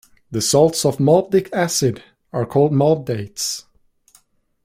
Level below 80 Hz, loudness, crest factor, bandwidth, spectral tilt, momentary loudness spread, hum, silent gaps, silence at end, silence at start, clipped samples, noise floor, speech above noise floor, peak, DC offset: -54 dBFS; -18 LUFS; 18 dB; 16 kHz; -5 dB/octave; 13 LU; none; none; 1.05 s; 0.3 s; under 0.1%; -56 dBFS; 39 dB; -2 dBFS; under 0.1%